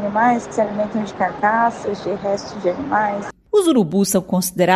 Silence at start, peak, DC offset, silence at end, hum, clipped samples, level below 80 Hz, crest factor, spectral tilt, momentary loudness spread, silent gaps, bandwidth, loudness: 0 s; -2 dBFS; under 0.1%; 0 s; none; under 0.1%; -54 dBFS; 18 dB; -5 dB/octave; 7 LU; none; 15 kHz; -19 LUFS